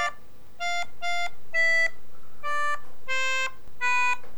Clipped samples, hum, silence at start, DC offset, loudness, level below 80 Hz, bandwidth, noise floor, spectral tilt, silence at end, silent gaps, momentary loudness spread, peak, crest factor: under 0.1%; none; 0 s; 5%; -27 LUFS; -60 dBFS; over 20 kHz; -54 dBFS; -0.5 dB/octave; 0 s; none; 10 LU; -12 dBFS; 14 dB